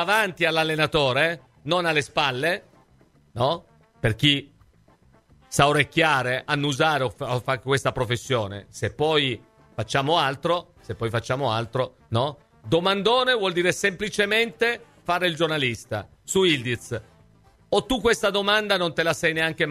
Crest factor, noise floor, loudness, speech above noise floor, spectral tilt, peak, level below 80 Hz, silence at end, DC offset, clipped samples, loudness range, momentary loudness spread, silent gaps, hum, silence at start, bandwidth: 22 dB; -58 dBFS; -23 LUFS; 35 dB; -4 dB/octave; -2 dBFS; -52 dBFS; 0 s; under 0.1%; under 0.1%; 3 LU; 11 LU; none; none; 0 s; 16 kHz